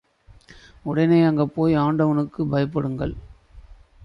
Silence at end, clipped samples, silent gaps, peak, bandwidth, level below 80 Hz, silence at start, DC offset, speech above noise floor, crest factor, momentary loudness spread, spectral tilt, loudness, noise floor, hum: 0 s; under 0.1%; none; -6 dBFS; 6 kHz; -46 dBFS; 0.85 s; under 0.1%; 30 dB; 16 dB; 13 LU; -9.5 dB/octave; -21 LUFS; -50 dBFS; none